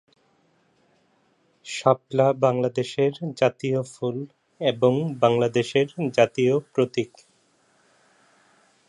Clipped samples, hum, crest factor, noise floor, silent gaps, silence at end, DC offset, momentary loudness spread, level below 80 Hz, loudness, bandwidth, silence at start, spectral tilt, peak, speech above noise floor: under 0.1%; none; 20 dB; -65 dBFS; none; 1.8 s; under 0.1%; 10 LU; -70 dBFS; -23 LUFS; 11 kHz; 1.65 s; -6 dB/octave; -4 dBFS; 42 dB